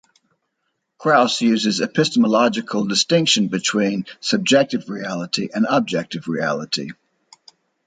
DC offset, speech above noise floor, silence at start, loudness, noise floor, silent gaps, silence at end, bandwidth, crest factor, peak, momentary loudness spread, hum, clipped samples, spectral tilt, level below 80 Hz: under 0.1%; 55 dB; 1 s; -19 LUFS; -74 dBFS; none; 0.95 s; 9.4 kHz; 18 dB; -2 dBFS; 9 LU; none; under 0.1%; -4 dB/octave; -66 dBFS